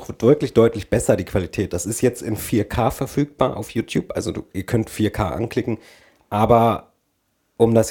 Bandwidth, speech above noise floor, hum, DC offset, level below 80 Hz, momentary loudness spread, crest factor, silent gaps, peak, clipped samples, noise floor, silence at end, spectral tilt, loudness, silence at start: 19 kHz; 49 dB; none; under 0.1%; -42 dBFS; 11 LU; 20 dB; none; 0 dBFS; under 0.1%; -69 dBFS; 0 s; -6 dB/octave; -21 LUFS; 0 s